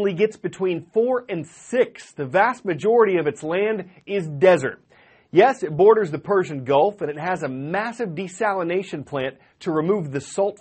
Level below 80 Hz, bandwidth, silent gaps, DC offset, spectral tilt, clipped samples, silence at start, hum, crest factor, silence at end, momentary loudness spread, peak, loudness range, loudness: -66 dBFS; 8.8 kHz; none; under 0.1%; -6 dB/octave; under 0.1%; 0 s; none; 18 dB; 0.05 s; 11 LU; -2 dBFS; 6 LU; -22 LUFS